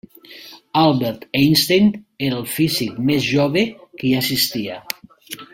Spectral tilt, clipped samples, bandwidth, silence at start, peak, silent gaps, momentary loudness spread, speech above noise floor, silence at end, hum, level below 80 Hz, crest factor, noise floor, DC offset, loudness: -4.5 dB/octave; under 0.1%; 16.5 kHz; 0.3 s; 0 dBFS; none; 16 LU; 24 dB; 0.1 s; none; -54 dBFS; 20 dB; -41 dBFS; under 0.1%; -18 LUFS